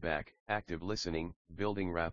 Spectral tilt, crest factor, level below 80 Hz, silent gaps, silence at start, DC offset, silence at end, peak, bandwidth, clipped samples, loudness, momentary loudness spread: -4 dB/octave; 20 dB; -54 dBFS; 0.40-0.46 s, 1.36-1.45 s; 0 s; under 0.1%; 0 s; -16 dBFS; 7.2 kHz; under 0.1%; -38 LUFS; 4 LU